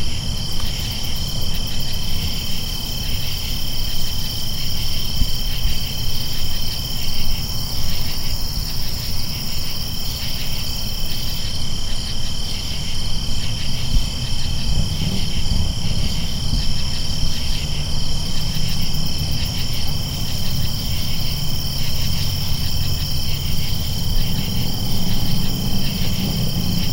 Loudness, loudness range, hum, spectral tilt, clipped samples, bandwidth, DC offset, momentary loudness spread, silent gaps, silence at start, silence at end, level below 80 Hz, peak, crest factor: -23 LUFS; 2 LU; none; -4 dB/octave; under 0.1%; 16 kHz; under 0.1%; 2 LU; none; 0 s; 0 s; -22 dBFS; -2 dBFS; 16 dB